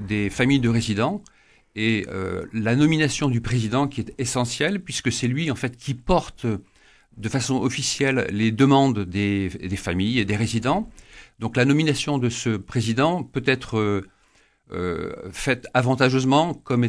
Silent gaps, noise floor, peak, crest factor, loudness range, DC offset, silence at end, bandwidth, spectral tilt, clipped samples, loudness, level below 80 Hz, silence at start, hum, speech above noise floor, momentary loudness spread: none; -60 dBFS; -4 dBFS; 18 dB; 3 LU; under 0.1%; 0 s; 11 kHz; -5.5 dB/octave; under 0.1%; -23 LUFS; -46 dBFS; 0 s; none; 38 dB; 10 LU